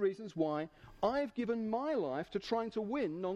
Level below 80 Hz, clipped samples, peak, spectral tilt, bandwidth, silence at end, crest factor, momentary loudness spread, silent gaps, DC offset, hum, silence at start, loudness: -66 dBFS; under 0.1%; -20 dBFS; -7 dB/octave; 9.4 kHz; 0 s; 16 dB; 3 LU; none; under 0.1%; none; 0 s; -37 LUFS